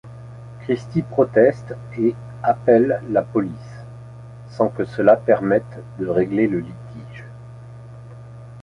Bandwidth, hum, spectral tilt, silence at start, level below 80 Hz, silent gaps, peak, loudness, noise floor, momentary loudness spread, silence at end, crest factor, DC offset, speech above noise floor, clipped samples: 10.5 kHz; none; -9 dB/octave; 0.05 s; -52 dBFS; none; -2 dBFS; -19 LUFS; -38 dBFS; 24 LU; 0.05 s; 18 dB; under 0.1%; 19 dB; under 0.1%